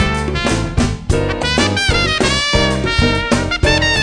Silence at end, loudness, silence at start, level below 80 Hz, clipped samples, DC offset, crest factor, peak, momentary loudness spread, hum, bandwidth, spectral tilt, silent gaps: 0 s; -15 LUFS; 0 s; -24 dBFS; under 0.1%; 0.5%; 14 dB; 0 dBFS; 4 LU; none; 10.5 kHz; -4 dB/octave; none